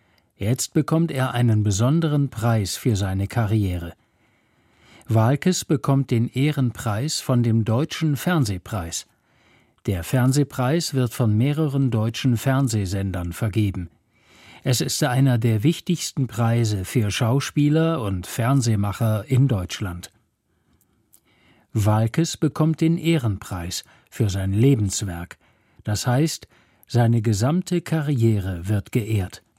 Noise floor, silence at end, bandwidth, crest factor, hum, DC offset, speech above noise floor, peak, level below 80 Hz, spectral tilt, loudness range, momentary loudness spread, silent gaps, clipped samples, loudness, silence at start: -67 dBFS; 0.2 s; 16 kHz; 16 dB; none; under 0.1%; 47 dB; -6 dBFS; -50 dBFS; -6 dB/octave; 3 LU; 9 LU; none; under 0.1%; -22 LUFS; 0.4 s